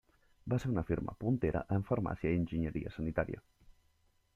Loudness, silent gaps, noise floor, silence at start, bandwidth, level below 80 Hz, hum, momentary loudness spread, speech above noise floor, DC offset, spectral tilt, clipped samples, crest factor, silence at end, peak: -36 LUFS; none; -72 dBFS; 0.45 s; 11.5 kHz; -52 dBFS; none; 5 LU; 38 dB; under 0.1%; -9 dB/octave; under 0.1%; 18 dB; 0.95 s; -18 dBFS